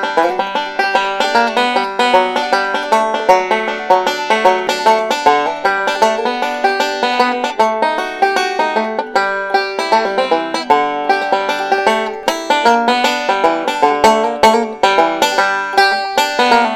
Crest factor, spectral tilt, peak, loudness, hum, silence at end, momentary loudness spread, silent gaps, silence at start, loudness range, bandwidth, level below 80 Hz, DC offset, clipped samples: 14 dB; -2.5 dB/octave; 0 dBFS; -14 LUFS; none; 0 s; 4 LU; none; 0 s; 2 LU; 17.5 kHz; -54 dBFS; under 0.1%; under 0.1%